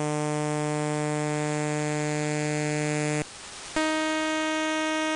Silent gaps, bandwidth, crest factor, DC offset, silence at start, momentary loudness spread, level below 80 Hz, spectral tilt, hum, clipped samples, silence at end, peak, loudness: none; 11 kHz; 18 dB; under 0.1%; 0 s; 3 LU; -60 dBFS; -4.5 dB/octave; none; under 0.1%; 0 s; -10 dBFS; -27 LUFS